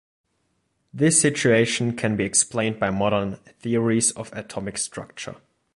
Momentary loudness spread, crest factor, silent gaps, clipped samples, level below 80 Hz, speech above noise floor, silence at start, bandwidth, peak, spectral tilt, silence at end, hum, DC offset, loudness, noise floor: 16 LU; 20 dB; none; under 0.1%; -54 dBFS; 49 dB; 0.95 s; 11.5 kHz; -4 dBFS; -4 dB/octave; 0.45 s; none; under 0.1%; -22 LUFS; -71 dBFS